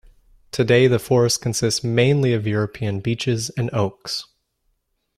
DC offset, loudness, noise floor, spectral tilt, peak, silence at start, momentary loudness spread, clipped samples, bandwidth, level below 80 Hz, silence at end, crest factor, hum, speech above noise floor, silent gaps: under 0.1%; -20 LUFS; -70 dBFS; -5 dB/octave; -4 dBFS; 0.55 s; 9 LU; under 0.1%; 15 kHz; -52 dBFS; 0.95 s; 18 dB; none; 50 dB; none